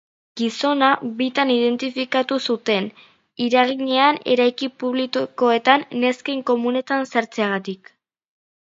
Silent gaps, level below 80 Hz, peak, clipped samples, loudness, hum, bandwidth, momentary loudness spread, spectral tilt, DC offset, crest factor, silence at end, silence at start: none; -74 dBFS; 0 dBFS; under 0.1%; -20 LUFS; none; 7.8 kHz; 9 LU; -4.5 dB/octave; under 0.1%; 20 dB; 0.9 s; 0.35 s